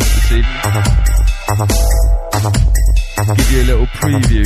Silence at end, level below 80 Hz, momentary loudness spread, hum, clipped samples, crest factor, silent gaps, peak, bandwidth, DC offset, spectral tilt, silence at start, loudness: 0 s; -12 dBFS; 3 LU; none; under 0.1%; 10 dB; none; 0 dBFS; 14 kHz; under 0.1%; -5 dB/octave; 0 s; -14 LUFS